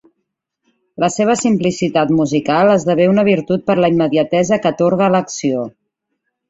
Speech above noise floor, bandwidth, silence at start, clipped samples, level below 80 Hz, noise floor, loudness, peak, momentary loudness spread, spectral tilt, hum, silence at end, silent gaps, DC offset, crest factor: 60 dB; 8 kHz; 1 s; under 0.1%; -54 dBFS; -74 dBFS; -15 LUFS; -2 dBFS; 7 LU; -6 dB/octave; none; 0.8 s; none; under 0.1%; 14 dB